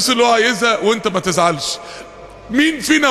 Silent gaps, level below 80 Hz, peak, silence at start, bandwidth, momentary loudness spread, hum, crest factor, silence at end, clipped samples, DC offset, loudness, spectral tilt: none; -50 dBFS; 0 dBFS; 0 s; 13 kHz; 12 LU; none; 16 dB; 0 s; under 0.1%; under 0.1%; -15 LUFS; -3 dB/octave